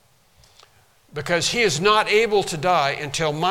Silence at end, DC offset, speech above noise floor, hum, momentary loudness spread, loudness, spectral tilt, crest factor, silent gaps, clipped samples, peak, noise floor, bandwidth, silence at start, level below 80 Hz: 0 s; under 0.1%; 36 dB; none; 7 LU; -19 LUFS; -3 dB/octave; 18 dB; none; under 0.1%; -2 dBFS; -56 dBFS; 16.5 kHz; 1.15 s; -50 dBFS